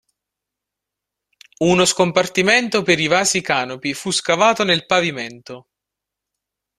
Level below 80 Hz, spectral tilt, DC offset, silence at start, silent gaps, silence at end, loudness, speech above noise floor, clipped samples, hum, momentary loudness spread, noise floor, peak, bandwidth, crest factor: -58 dBFS; -3 dB/octave; under 0.1%; 1.6 s; none; 1.2 s; -17 LUFS; 66 dB; under 0.1%; none; 10 LU; -84 dBFS; 0 dBFS; 14 kHz; 20 dB